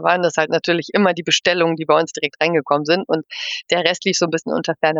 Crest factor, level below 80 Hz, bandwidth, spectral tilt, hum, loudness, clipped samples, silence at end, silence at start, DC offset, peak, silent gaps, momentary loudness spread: 16 dB; -70 dBFS; 8 kHz; -3.5 dB/octave; none; -18 LUFS; under 0.1%; 0 s; 0 s; under 0.1%; -2 dBFS; none; 6 LU